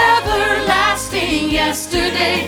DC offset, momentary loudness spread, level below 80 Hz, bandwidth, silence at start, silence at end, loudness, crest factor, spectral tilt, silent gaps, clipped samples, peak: under 0.1%; 4 LU; -34 dBFS; over 20 kHz; 0 s; 0 s; -16 LUFS; 14 dB; -3 dB/octave; none; under 0.1%; -2 dBFS